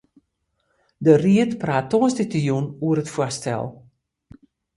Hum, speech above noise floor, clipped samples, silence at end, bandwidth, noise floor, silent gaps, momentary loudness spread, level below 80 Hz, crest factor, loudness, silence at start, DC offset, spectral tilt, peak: none; 53 dB; under 0.1%; 1 s; 11.5 kHz; -73 dBFS; none; 10 LU; -58 dBFS; 20 dB; -21 LUFS; 1 s; under 0.1%; -6.5 dB/octave; -2 dBFS